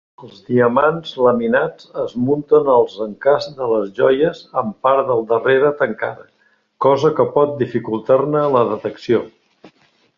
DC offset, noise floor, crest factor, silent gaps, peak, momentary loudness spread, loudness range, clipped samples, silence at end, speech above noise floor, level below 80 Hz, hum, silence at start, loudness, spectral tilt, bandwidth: under 0.1%; -54 dBFS; 16 dB; none; -2 dBFS; 8 LU; 1 LU; under 0.1%; 0.5 s; 38 dB; -58 dBFS; none; 0.2 s; -17 LUFS; -7.5 dB/octave; 7 kHz